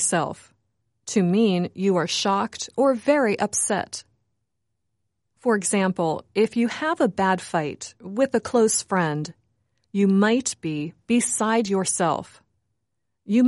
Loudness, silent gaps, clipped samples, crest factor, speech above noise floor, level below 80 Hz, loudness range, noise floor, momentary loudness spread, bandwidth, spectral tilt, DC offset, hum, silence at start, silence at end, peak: -23 LUFS; none; under 0.1%; 16 dB; 58 dB; -66 dBFS; 3 LU; -80 dBFS; 11 LU; 11.5 kHz; -4.5 dB/octave; under 0.1%; none; 0 s; 0 s; -8 dBFS